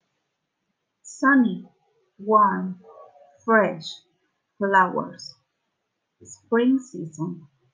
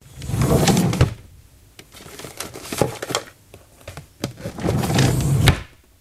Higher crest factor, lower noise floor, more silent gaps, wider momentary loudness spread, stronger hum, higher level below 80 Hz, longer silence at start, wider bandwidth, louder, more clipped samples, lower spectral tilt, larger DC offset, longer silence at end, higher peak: about the same, 20 dB vs 22 dB; first, -78 dBFS vs -48 dBFS; neither; about the same, 22 LU vs 22 LU; neither; second, -80 dBFS vs -34 dBFS; first, 1.05 s vs 0.15 s; second, 9.6 kHz vs 15.5 kHz; about the same, -22 LUFS vs -21 LUFS; neither; about the same, -6 dB/octave vs -5 dB/octave; neither; about the same, 0.35 s vs 0.35 s; second, -6 dBFS vs 0 dBFS